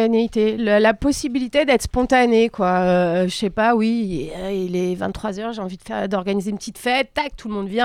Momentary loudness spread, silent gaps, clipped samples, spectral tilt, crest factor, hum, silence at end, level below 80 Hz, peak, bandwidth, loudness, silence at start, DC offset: 10 LU; none; under 0.1%; -5.5 dB/octave; 14 dB; none; 0 s; -40 dBFS; -6 dBFS; 15 kHz; -20 LUFS; 0 s; under 0.1%